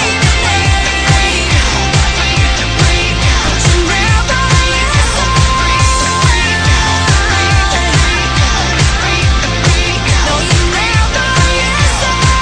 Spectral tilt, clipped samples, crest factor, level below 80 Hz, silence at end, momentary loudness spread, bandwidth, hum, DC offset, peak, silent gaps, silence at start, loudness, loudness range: -3.5 dB/octave; under 0.1%; 10 dB; -16 dBFS; 0 s; 1 LU; 10.5 kHz; none; under 0.1%; 0 dBFS; none; 0 s; -10 LUFS; 1 LU